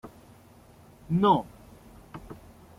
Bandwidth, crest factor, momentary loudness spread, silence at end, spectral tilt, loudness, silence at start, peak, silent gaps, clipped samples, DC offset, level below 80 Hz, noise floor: 15.5 kHz; 22 dB; 25 LU; 0.45 s; -8 dB/octave; -25 LUFS; 0.05 s; -10 dBFS; none; under 0.1%; under 0.1%; -56 dBFS; -54 dBFS